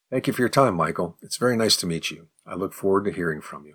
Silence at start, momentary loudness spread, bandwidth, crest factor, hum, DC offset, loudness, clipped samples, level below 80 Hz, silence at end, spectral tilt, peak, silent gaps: 0.1 s; 12 LU; 19.5 kHz; 18 dB; none; under 0.1%; -23 LUFS; under 0.1%; -60 dBFS; 0.05 s; -4 dB/octave; -6 dBFS; none